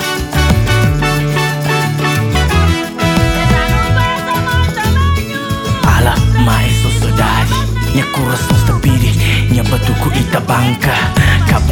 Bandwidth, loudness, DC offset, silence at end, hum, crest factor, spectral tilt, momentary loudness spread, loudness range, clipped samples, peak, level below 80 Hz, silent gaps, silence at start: 18.5 kHz; -12 LUFS; under 0.1%; 0 s; none; 12 dB; -5.5 dB/octave; 4 LU; 1 LU; under 0.1%; 0 dBFS; -20 dBFS; none; 0 s